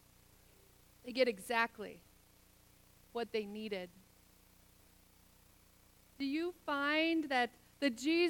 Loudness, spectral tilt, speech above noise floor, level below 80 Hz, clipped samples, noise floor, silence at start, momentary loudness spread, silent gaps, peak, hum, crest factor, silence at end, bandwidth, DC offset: -37 LUFS; -3.5 dB/octave; 30 dB; -72 dBFS; under 0.1%; -66 dBFS; 1.05 s; 16 LU; none; -18 dBFS; 60 Hz at -75 dBFS; 22 dB; 0 s; 19 kHz; under 0.1%